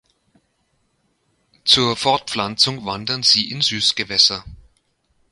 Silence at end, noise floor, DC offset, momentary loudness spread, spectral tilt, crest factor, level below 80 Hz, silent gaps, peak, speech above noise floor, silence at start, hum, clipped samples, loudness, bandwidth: 0.7 s; -67 dBFS; under 0.1%; 9 LU; -2.5 dB/octave; 22 dB; -52 dBFS; none; 0 dBFS; 48 dB; 1.65 s; none; under 0.1%; -16 LUFS; 11.5 kHz